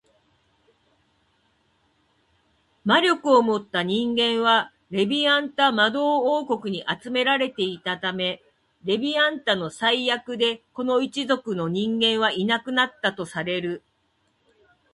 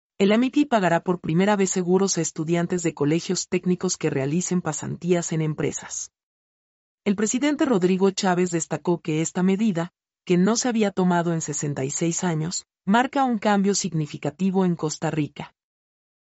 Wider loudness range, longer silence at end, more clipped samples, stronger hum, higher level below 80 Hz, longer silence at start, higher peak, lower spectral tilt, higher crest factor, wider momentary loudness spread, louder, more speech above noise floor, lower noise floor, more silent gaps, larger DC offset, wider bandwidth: about the same, 4 LU vs 3 LU; first, 1.15 s vs 0.9 s; neither; neither; about the same, -68 dBFS vs -64 dBFS; first, 2.85 s vs 0.2 s; first, -4 dBFS vs -8 dBFS; about the same, -4.5 dB/octave vs -5 dB/octave; about the same, 20 dB vs 16 dB; about the same, 9 LU vs 8 LU; about the same, -22 LUFS vs -23 LUFS; second, 46 dB vs over 67 dB; second, -69 dBFS vs under -90 dBFS; second, none vs 6.23-6.98 s; neither; first, 11.5 kHz vs 8.2 kHz